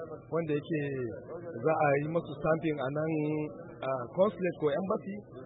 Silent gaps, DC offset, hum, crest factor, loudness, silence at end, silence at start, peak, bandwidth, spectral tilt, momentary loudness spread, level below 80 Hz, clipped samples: none; under 0.1%; none; 18 dB; -32 LUFS; 0 s; 0 s; -14 dBFS; 4 kHz; -11 dB/octave; 11 LU; -64 dBFS; under 0.1%